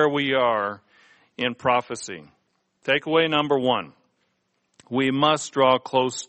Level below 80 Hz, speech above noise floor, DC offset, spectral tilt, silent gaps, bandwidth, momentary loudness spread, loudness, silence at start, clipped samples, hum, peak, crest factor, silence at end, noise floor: -66 dBFS; 50 dB; under 0.1%; -4 dB/octave; none; 8.8 kHz; 14 LU; -22 LUFS; 0 s; under 0.1%; none; -4 dBFS; 18 dB; 0.05 s; -72 dBFS